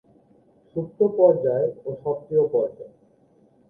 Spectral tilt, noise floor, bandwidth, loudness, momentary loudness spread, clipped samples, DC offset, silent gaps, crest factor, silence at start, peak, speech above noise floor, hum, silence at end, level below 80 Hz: -12 dB/octave; -59 dBFS; 1.8 kHz; -23 LUFS; 14 LU; under 0.1%; under 0.1%; none; 18 dB; 0.75 s; -6 dBFS; 37 dB; none; 0.8 s; -66 dBFS